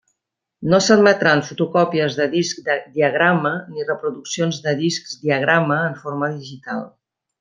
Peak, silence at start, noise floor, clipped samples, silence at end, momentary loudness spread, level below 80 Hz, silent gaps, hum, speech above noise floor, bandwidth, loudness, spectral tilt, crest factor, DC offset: 0 dBFS; 0.6 s; -79 dBFS; under 0.1%; 0.55 s; 13 LU; -62 dBFS; none; none; 60 dB; 9.8 kHz; -19 LUFS; -5 dB/octave; 18 dB; under 0.1%